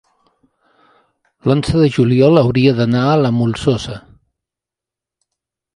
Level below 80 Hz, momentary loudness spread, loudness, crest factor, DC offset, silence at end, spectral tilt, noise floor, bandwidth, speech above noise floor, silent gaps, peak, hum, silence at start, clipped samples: -42 dBFS; 11 LU; -14 LUFS; 16 dB; under 0.1%; 1.75 s; -7.5 dB/octave; -86 dBFS; 11 kHz; 73 dB; none; 0 dBFS; none; 1.45 s; under 0.1%